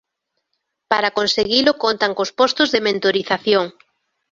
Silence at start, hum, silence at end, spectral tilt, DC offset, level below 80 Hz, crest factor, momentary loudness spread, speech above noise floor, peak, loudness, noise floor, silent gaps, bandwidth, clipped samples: 0.9 s; none; 0.6 s; -3.5 dB/octave; under 0.1%; -58 dBFS; 20 dB; 4 LU; 59 dB; 0 dBFS; -17 LUFS; -76 dBFS; none; 7.6 kHz; under 0.1%